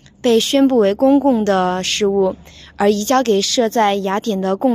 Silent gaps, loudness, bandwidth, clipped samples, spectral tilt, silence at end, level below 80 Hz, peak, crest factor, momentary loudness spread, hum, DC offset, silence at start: none; -16 LUFS; 15.5 kHz; under 0.1%; -4 dB/octave; 0 s; -50 dBFS; -2 dBFS; 12 dB; 6 LU; none; under 0.1%; 0.25 s